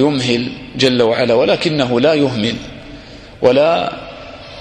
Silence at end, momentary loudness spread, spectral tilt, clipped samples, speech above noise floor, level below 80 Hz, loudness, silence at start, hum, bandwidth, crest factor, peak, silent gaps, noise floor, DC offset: 0 s; 20 LU; -5.5 dB/octave; under 0.1%; 21 dB; -44 dBFS; -14 LUFS; 0 s; none; 10.5 kHz; 16 dB; 0 dBFS; none; -35 dBFS; under 0.1%